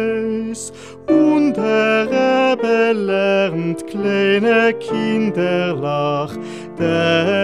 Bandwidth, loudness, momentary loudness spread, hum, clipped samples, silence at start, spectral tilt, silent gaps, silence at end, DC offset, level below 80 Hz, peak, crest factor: 11 kHz; -17 LUFS; 9 LU; none; under 0.1%; 0 s; -5.5 dB/octave; none; 0 s; 0.3%; -60 dBFS; -4 dBFS; 14 dB